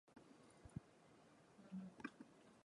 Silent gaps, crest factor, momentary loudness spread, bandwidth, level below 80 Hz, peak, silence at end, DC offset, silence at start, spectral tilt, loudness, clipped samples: none; 24 dB; 13 LU; 11 kHz; -78 dBFS; -34 dBFS; 0.05 s; under 0.1%; 0.05 s; -6.5 dB/octave; -60 LUFS; under 0.1%